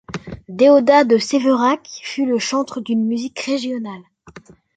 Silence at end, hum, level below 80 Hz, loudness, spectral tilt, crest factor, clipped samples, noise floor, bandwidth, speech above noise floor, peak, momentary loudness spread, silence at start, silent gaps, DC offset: 0.35 s; none; -54 dBFS; -17 LUFS; -4.5 dB/octave; 16 dB; under 0.1%; -43 dBFS; 9.2 kHz; 27 dB; -2 dBFS; 19 LU; 0.1 s; none; under 0.1%